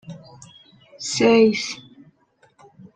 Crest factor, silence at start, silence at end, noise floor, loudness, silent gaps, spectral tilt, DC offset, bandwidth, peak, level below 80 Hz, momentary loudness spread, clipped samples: 18 dB; 0.1 s; 1.15 s; -60 dBFS; -19 LUFS; none; -4 dB/octave; under 0.1%; 9.4 kHz; -4 dBFS; -64 dBFS; 25 LU; under 0.1%